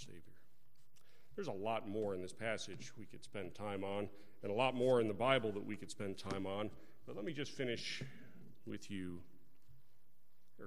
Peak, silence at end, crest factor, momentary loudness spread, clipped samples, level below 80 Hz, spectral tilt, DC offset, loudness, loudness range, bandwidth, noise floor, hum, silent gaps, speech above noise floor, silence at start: -18 dBFS; 0 s; 26 dB; 19 LU; under 0.1%; -72 dBFS; -5 dB/octave; 0.4%; -41 LUFS; 8 LU; 16 kHz; -78 dBFS; none; none; 37 dB; 0 s